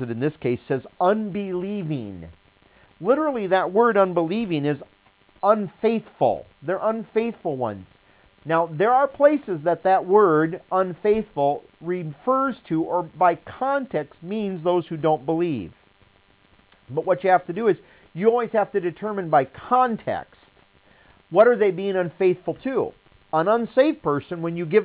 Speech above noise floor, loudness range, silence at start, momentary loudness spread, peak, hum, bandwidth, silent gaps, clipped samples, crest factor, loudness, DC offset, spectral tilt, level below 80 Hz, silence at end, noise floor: 36 dB; 4 LU; 0 s; 11 LU; -4 dBFS; none; 4 kHz; none; under 0.1%; 18 dB; -23 LUFS; under 0.1%; -10.5 dB/octave; -60 dBFS; 0 s; -58 dBFS